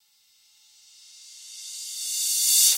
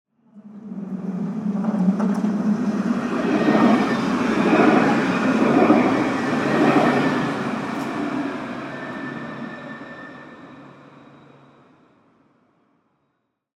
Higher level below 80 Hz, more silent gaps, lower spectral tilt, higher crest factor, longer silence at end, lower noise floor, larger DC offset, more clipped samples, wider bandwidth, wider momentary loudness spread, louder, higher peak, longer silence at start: second, under -90 dBFS vs -58 dBFS; neither; second, 8 dB/octave vs -7 dB/octave; about the same, 22 dB vs 20 dB; second, 0 s vs 2.85 s; second, -62 dBFS vs -73 dBFS; neither; neither; first, 16 kHz vs 12 kHz; first, 26 LU vs 19 LU; about the same, -22 LUFS vs -20 LUFS; second, -6 dBFS vs -2 dBFS; first, 1.2 s vs 0.35 s